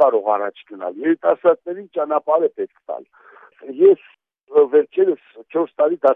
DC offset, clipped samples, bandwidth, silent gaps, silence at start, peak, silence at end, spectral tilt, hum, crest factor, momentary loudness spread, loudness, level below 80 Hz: under 0.1%; under 0.1%; 3.8 kHz; 4.43-4.47 s; 0 s; -2 dBFS; 0 s; -8.5 dB/octave; none; 16 dB; 15 LU; -18 LUFS; -84 dBFS